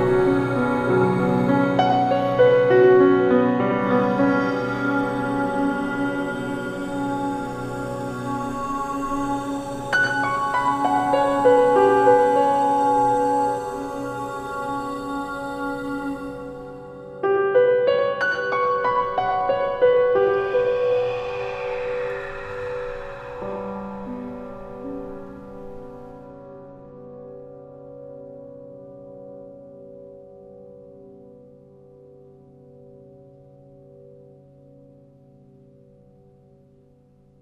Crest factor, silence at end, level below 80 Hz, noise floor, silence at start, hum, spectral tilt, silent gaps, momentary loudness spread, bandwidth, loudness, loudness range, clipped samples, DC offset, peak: 18 dB; 6.05 s; -50 dBFS; -55 dBFS; 0 s; none; -6.5 dB/octave; none; 24 LU; 12.5 kHz; -21 LUFS; 23 LU; under 0.1%; under 0.1%; -4 dBFS